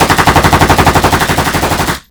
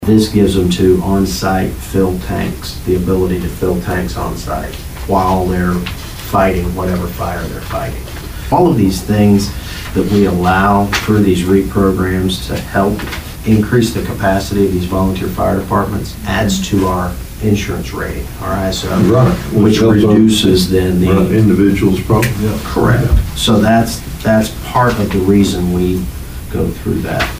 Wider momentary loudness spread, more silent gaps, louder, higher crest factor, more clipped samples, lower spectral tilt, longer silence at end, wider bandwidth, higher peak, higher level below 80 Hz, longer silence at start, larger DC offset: second, 5 LU vs 11 LU; neither; first, -9 LUFS vs -14 LUFS; about the same, 10 dB vs 12 dB; first, 2% vs under 0.1%; second, -4 dB/octave vs -6 dB/octave; about the same, 0.1 s vs 0 s; first, over 20 kHz vs 16 kHz; about the same, 0 dBFS vs 0 dBFS; about the same, -22 dBFS vs -26 dBFS; about the same, 0 s vs 0 s; neither